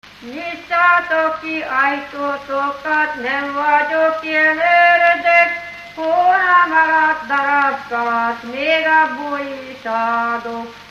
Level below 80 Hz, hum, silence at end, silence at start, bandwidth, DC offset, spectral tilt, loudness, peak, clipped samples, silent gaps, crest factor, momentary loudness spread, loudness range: -58 dBFS; none; 0.05 s; 0.2 s; 8 kHz; under 0.1%; -3.5 dB/octave; -15 LUFS; 0 dBFS; under 0.1%; none; 16 dB; 13 LU; 5 LU